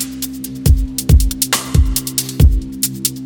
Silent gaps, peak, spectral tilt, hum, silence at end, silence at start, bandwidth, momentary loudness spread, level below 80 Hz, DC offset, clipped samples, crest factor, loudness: none; 0 dBFS; -4 dB/octave; none; 0 s; 0 s; 19.5 kHz; 7 LU; -16 dBFS; under 0.1%; under 0.1%; 14 dB; -16 LUFS